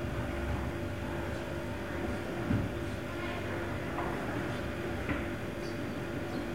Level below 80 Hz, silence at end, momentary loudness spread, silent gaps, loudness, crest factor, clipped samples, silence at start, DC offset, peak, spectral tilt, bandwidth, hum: -46 dBFS; 0 s; 4 LU; none; -36 LUFS; 18 dB; under 0.1%; 0 s; 0.3%; -18 dBFS; -6.5 dB/octave; 16 kHz; none